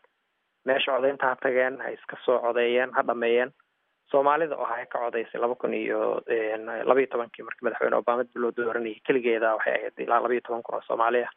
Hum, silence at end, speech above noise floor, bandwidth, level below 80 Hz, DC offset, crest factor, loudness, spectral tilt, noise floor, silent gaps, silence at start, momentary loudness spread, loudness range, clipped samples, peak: none; 0.05 s; 50 dB; 3.9 kHz; -90 dBFS; under 0.1%; 22 dB; -26 LUFS; -1.5 dB/octave; -75 dBFS; none; 0.65 s; 8 LU; 2 LU; under 0.1%; -4 dBFS